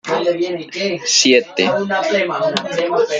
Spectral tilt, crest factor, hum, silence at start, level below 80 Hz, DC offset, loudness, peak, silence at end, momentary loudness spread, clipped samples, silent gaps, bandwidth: -2.5 dB/octave; 16 dB; none; 0.05 s; -62 dBFS; under 0.1%; -16 LUFS; 0 dBFS; 0 s; 9 LU; under 0.1%; none; 9.6 kHz